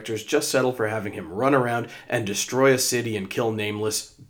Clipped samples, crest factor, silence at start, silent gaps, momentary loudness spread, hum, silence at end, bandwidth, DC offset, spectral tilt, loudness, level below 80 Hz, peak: under 0.1%; 18 dB; 0 s; none; 9 LU; none; 0.05 s; over 20 kHz; under 0.1%; -4 dB/octave; -24 LUFS; -66 dBFS; -6 dBFS